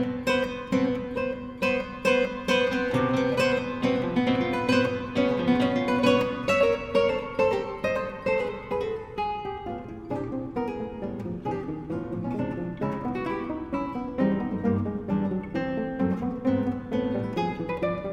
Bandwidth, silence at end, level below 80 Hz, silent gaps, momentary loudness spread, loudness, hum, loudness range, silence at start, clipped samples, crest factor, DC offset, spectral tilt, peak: 13.5 kHz; 0 s; -50 dBFS; none; 9 LU; -27 LUFS; none; 8 LU; 0 s; under 0.1%; 18 dB; under 0.1%; -6.5 dB/octave; -8 dBFS